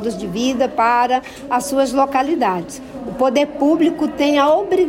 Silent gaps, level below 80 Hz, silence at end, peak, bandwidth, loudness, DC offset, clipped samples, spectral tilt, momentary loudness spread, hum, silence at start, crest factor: none; -50 dBFS; 0 s; -6 dBFS; 16.5 kHz; -17 LUFS; under 0.1%; under 0.1%; -4.5 dB/octave; 8 LU; none; 0 s; 12 dB